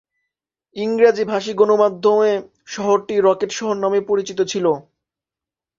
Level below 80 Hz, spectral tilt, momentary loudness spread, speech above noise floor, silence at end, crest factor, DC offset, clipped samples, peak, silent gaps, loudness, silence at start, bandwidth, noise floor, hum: -64 dBFS; -4.5 dB/octave; 10 LU; 71 dB; 1 s; 16 dB; under 0.1%; under 0.1%; -2 dBFS; none; -18 LUFS; 0.75 s; 7.6 kHz; -89 dBFS; none